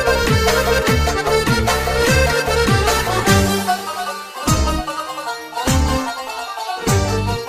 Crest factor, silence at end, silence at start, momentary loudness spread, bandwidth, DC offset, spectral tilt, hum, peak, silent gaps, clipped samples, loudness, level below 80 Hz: 16 dB; 0 s; 0 s; 10 LU; 15.5 kHz; under 0.1%; -4 dB/octave; none; -2 dBFS; none; under 0.1%; -17 LUFS; -26 dBFS